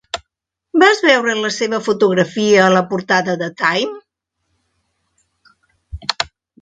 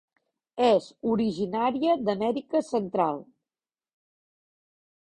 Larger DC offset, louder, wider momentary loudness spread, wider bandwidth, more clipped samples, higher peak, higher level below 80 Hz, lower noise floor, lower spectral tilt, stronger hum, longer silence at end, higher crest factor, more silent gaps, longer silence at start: neither; first, -15 LUFS vs -26 LUFS; first, 14 LU vs 6 LU; second, 9.4 kHz vs 10.5 kHz; neither; first, 0 dBFS vs -10 dBFS; first, -46 dBFS vs -66 dBFS; second, -79 dBFS vs under -90 dBFS; second, -4 dB/octave vs -6.5 dB/octave; neither; second, 0.35 s vs 1.9 s; about the same, 18 dB vs 18 dB; neither; second, 0.15 s vs 0.55 s